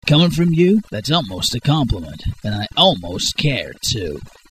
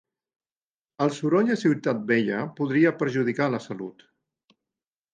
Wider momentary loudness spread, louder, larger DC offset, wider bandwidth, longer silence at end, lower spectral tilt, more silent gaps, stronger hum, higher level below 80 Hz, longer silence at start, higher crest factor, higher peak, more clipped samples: about the same, 11 LU vs 9 LU; first, -17 LUFS vs -24 LUFS; first, 0.4% vs under 0.1%; first, 14 kHz vs 9.2 kHz; second, 0.25 s vs 1.2 s; second, -5 dB/octave vs -7 dB/octave; neither; neither; first, -36 dBFS vs -74 dBFS; second, 0.05 s vs 1 s; about the same, 18 dB vs 18 dB; first, 0 dBFS vs -8 dBFS; neither